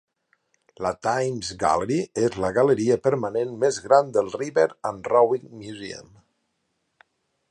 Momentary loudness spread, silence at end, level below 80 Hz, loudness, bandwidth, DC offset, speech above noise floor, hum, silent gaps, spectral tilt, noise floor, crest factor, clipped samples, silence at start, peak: 14 LU; 1.5 s; -58 dBFS; -23 LUFS; 11 kHz; under 0.1%; 52 dB; none; none; -5.5 dB/octave; -74 dBFS; 20 dB; under 0.1%; 0.8 s; -4 dBFS